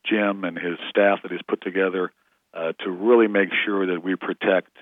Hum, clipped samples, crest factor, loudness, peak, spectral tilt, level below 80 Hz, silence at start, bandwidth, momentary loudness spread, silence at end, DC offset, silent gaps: none; under 0.1%; 20 dB; -23 LUFS; -4 dBFS; -8 dB/octave; -84 dBFS; 0.05 s; 3.9 kHz; 11 LU; 0.2 s; under 0.1%; none